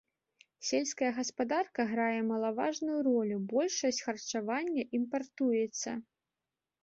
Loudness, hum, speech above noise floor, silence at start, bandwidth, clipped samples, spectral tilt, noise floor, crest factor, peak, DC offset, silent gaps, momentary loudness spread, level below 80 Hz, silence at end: -33 LUFS; none; over 57 dB; 0.6 s; 8 kHz; under 0.1%; -3.5 dB/octave; under -90 dBFS; 16 dB; -18 dBFS; under 0.1%; none; 6 LU; -78 dBFS; 0.8 s